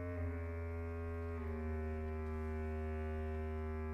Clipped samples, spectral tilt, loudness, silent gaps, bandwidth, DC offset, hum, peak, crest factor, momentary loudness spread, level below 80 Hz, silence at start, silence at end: under 0.1%; -9.5 dB/octave; -43 LUFS; none; 5.6 kHz; under 0.1%; none; -32 dBFS; 10 dB; 2 LU; -46 dBFS; 0 s; 0 s